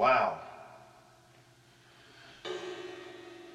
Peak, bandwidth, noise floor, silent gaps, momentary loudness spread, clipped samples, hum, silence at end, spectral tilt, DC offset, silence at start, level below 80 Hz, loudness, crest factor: -14 dBFS; 12.5 kHz; -61 dBFS; none; 27 LU; under 0.1%; none; 0 s; -4.5 dB/octave; under 0.1%; 0 s; -76 dBFS; -35 LUFS; 22 dB